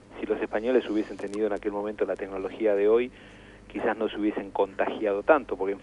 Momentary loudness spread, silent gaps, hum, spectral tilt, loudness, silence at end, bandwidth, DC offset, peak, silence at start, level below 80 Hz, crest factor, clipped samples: 9 LU; none; 50 Hz at -60 dBFS; -6.5 dB/octave; -27 LUFS; 0 s; 10.5 kHz; under 0.1%; -6 dBFS; 0.1 s; -56 dBFS; 20 dB; under 0.1%